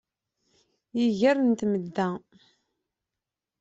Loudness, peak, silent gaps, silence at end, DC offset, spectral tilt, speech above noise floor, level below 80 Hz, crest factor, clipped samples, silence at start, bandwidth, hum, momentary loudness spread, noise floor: -26 LUFS; -10 dBFS; none; 1.4 s; under 0.1%; -6.5 dB/octave; 63 dB; -70 dBFS; 18 dB; under 0.1%; 0.95 s; 8 kHz; none; 11 LU; -88 dBFS